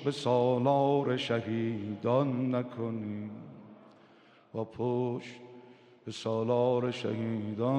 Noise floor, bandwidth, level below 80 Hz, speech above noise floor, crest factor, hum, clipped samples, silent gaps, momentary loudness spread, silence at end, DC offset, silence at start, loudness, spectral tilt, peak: -60 dBFS; 10 kHz; -76 dBFS; 29 dB; 18 dB; none; under 0.1%; none; 19 LU; 0 s; under 0.1%; 0 s; -31 LUFS; -7.5 dB/octave; -14 dBFS